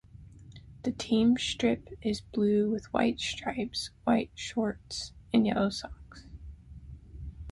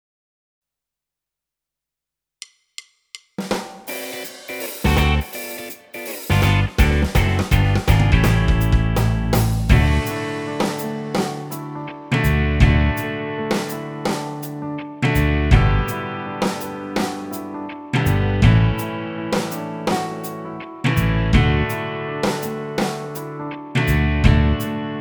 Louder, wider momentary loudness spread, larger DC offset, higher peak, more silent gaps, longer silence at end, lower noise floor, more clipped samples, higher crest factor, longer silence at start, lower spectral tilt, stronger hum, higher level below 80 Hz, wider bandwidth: second, -30 LUFS vs -20 LUFS; first, 23 LU vs 14 LU; neither; second, -12 dBFS vs 0 dBFS; neither; about the same, 0 s vs 0 s; second, -50 dBFS vs -86 dBFS; neither; about the same, 18 dB vs 20 dB; second, 0.15 s vs 3.15 s; about the same, -5 dB/octave vs -6 dB/octave; neither; second, -52 dBFS vs -26 dBFS; second, 11.5 kHz vs over 20 kHz